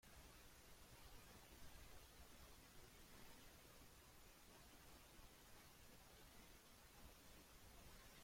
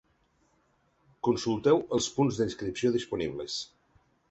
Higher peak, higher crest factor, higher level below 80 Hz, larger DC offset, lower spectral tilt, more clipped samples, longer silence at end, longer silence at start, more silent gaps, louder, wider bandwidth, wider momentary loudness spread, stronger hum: second, -48 dBFS vs -12 dBFS; about the same, 16 dB vs 20 dB; second, -70 dBFS vs -60 dBFS; neither; second, -3 dB/octave vs -5 dB/octave; neither; second, 0 s vs 0.65 s; second, 0 s vs 1.25 s; neither; second, -65 LUFS vs -29 LUFS; first, 16.5 kHz vs 8.2 kHz; second, 2 LU vs 10 LU; neither